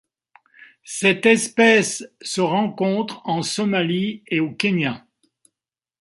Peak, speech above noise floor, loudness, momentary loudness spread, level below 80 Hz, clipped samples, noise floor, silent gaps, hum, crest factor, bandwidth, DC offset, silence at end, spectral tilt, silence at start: -2 dBFS; 69 dB; -20 LUFS; 11 LU; -66 dBFS; under 0.1%; -89 dBFS; none; none; 20 dB; 11.5 kHz; under 0.1%; 1 s; -4 dB/octave; 0.6 s